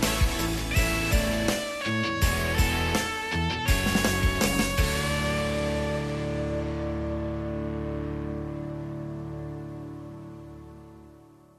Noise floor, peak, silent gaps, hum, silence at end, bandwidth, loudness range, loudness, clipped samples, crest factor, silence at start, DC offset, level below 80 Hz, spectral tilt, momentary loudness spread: -52 dBFS; -10 dBFS; none; none; 0.35 s; 14 kHz; 10 LU; -27 LUFS; under 0.1%; 18 dB; 0 s; under 0.1%; -34 dBFS; -4.5 dB/octave; 15 LU